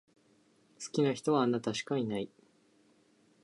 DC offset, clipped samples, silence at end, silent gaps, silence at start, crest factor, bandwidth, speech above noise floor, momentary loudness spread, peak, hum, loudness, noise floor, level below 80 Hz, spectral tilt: under 0.1%; under 0.1%; 1.15 s; none; 0.8 s; 18 dB; 11.5 kHz; 36 dB; 12 LU; -16 dBFS; none; -32 LUFS; -68 dBFS; -76 dBFS; -5.5 dB/octave